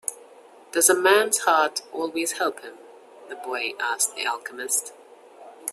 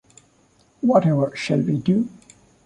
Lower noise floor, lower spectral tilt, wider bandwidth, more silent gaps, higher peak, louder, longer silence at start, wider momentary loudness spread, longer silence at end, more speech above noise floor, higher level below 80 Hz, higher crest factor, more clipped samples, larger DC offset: second, -49 dBFS vs -59 dBFS; second, 0 dB/octave vs -7.5 dB/octave; first, 15.5 kHz vs 10.5 kHz; neither; about the same, -4 dBFS vs -4 dBFS; about the same, -23 LUFS vs -21 LUFS; second, 0.1 s vs 0.85 s; first, 18 LU vs 6 LU; second, 0 s vs 0.6 s; second, 26 dB vs 39 dB; second, -76 dBFS vs -60 dBFS; about the same, 22 dB vs 18 dB; neither; neither